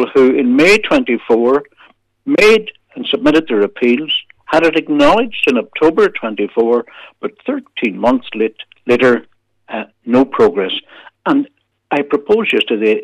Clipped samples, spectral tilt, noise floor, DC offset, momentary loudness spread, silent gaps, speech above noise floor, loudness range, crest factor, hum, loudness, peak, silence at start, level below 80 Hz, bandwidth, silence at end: under 0.1%; -5 dB/octave; -49 dBFS; under 0.1%; 14 LU; none; 36 dB; 4 LU; 12 dB; none; -14 LUFS; -2 dBFS; 0 s; -46 dBFS; 13.5 kHz; 0 s